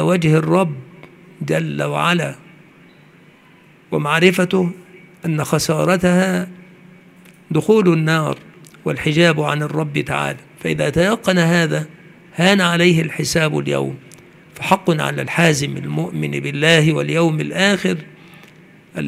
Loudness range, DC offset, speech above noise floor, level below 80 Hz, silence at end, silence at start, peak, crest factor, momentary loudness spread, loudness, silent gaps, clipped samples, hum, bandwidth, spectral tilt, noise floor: 3 LU; under 0.1%; 32 dB; -52 dBFS; 0 s; 0 s; 0 dBFS; 18 dB; 12 LU; -17 LUFS; none; under 0.1%; none; 15.5 kHz; -5.5 dB/octave; -48 dBFS